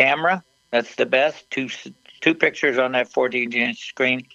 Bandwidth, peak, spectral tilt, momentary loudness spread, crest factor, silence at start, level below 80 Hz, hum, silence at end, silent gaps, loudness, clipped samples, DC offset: 8.4 kHz; 0 dBFS; -4.5 dB/octave; 9 LU; 20 dB; 0 s; -74 dBFS; none; 0.15 s; none; -21 LUFS; under 0.1%; under 0.1%